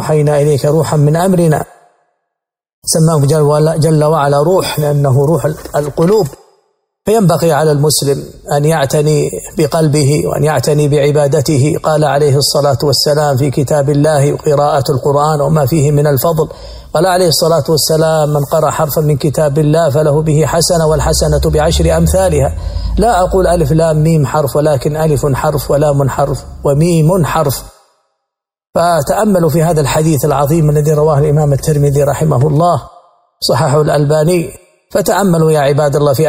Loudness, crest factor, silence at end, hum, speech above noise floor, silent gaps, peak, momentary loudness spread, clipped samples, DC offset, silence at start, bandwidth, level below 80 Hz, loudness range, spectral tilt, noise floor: -11 LUFS; 10 dB; 0 s; none; 66 dB; 2.73-2.82 s; 0 dBFS; 5 LU; under 0.1%; under 0.1%; 0 s; 16.5 kHz; -28 dBFS; 2 LU; -6 dB/octave; -77 dBFS